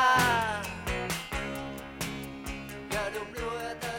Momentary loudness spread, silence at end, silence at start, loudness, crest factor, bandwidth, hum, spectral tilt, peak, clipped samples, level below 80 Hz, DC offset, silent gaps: 13 LU; 0 s; 0 s; -32 LUFS; 18 dB; 18.5 kHz; none; -3.5 dB/octave; -12 dBFS; under 0.1%; -46 dBFS; under 0.1%; none